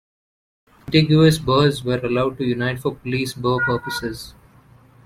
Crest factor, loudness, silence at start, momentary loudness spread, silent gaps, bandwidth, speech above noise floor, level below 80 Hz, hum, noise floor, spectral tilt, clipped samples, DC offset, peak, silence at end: 18 dB; -19 LUFS; 0.85 s; 12 LU; none; 15 kHz; 31 dB; -46 dBFS; none; -50 dBFS; -6 dB/octave; under 0.1%; under 0.1%; -2 dBFS; 0.75 s